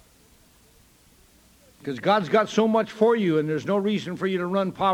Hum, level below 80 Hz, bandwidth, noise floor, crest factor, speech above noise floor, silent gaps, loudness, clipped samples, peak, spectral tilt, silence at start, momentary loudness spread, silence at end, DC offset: none; -62 dBFS; 15.5 kHz; -57 dBFS; 18 dB; 34 dB; none; -23 LUFS; under 0.1%; -6 dBFS; -6.5 dB/octave; 1.85 s; 7 LU; 0 s; under 0.1%